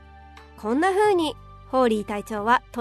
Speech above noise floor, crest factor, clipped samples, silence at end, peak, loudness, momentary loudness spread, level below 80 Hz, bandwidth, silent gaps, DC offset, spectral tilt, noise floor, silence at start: 24 dB; 16 dB; under 0.1%; 0 s; -8 dBFS; -23 LUFS; 10 LU; -50 dBFS; 13.5 kHz; none; under 0.1%; -5 dB/octave; -46 dBFS; 0.25 s